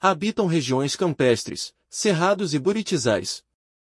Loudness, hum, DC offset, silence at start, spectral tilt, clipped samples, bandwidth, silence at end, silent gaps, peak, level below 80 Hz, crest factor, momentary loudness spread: -23 LUFS; none; under 0.1%; 0 s; -4.5 dB/octave; under 0.1%; 12 kHz; 0.5 s; none; -6 dBFS; -64 dBFS; 18 dB; 10 LU